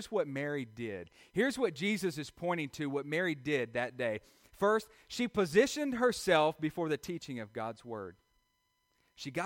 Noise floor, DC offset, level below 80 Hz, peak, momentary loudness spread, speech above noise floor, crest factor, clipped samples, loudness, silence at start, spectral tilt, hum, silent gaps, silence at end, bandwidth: -78 dBFS; under 0.1%; -68 dBFS; -14 dBFS; 13 LU; 44 dB; 20 dB; under 0.1%; -34 LUFS; 0 s; -5 dB/octave; none; none; 0 s; 16.5 kHz